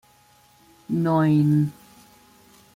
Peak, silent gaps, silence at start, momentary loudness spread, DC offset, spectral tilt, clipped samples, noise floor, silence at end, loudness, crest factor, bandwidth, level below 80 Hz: -10 dBFS; none; 0.9 s; 10 LU; under 0.1%; -9 dB/octave; under 0.1%; -57 dBFS; 1.05 s; -21 LUFS; 16 dB; 14.5 kHz; -62 dBFS